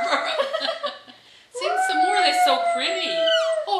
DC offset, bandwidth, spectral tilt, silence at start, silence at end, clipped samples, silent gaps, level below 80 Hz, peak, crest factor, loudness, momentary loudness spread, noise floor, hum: under 0.1%; 14 kHz; 0 dB/octave; 0 s; 0 s; under 0.1%; none; -80 dBFS; -6 dBFS; 16 dB; -21 LUFS; 12 LU; -49 dBFS; none